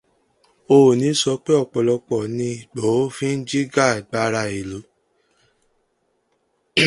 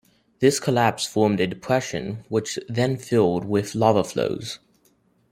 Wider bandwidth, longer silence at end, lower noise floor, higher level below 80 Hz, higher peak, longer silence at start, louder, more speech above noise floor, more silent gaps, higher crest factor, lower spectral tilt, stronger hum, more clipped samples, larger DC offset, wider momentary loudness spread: second, 11.5 kHz vs 16 kHz; second, 0 s vs 0.75 s; first, -68 dBFS vs -63 dBFS; about the same, -58 dBFS vs -58 dBFS; about the same, -2 dBFS vs -2 dBFS; first, 0.7 s vs 0.4 s; first, -20 LUFS vs -23 LUFS; first, 49 dB vs 41 dB; neither; about the same, 20 dB vs 20 dB; about the same, -5 dB/octave vs -5 dB/octave; neither; neither; neither; first, 12 LU vs 9 LU